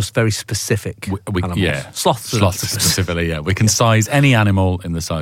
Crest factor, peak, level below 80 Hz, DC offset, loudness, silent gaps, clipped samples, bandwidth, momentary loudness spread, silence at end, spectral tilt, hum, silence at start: 14 dB; -2 dBFS; -38 dBFS; under 0.1%; -17 LUFS; none; under 0.1%; 17 kHz; 9 LU; 0 s; -4.5 dB/octave; none; 0 s